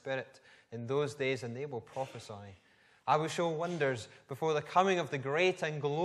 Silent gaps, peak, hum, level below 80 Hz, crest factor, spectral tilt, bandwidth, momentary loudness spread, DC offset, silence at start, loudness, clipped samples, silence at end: none; -14 dBFS; none; -78 dBFS; 20 dB; -5.5 dB/octave; 13.5 kHz; 17 LU; under 0.1%; 0.05 s; -34 LUFS; under 0.1%; 0 s